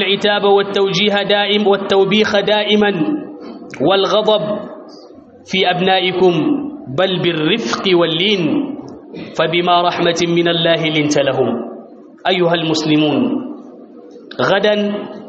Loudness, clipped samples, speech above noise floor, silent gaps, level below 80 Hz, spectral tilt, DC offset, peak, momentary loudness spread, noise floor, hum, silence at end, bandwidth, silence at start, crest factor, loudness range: -15 LUFS; under 0.1%; 25 dB; none; -58 dBFS; -3 dB/octave; under 0.1%; 0 dBFS; 13 LU; -39 dBFS; none; 0 s; 7.6 kHz; 0 s; 14 dB; 3 LU